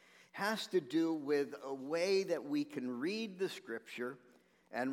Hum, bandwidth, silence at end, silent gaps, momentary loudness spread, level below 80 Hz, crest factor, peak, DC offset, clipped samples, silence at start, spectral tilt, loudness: none; 16.5 kHz; 0 s; none; 11 LU; under -90 dBFS; 16 dB; -22 dBFS; under 0.1%; under 0.1%; 0.35 s; -4.5 dB/octave; -38 LUFS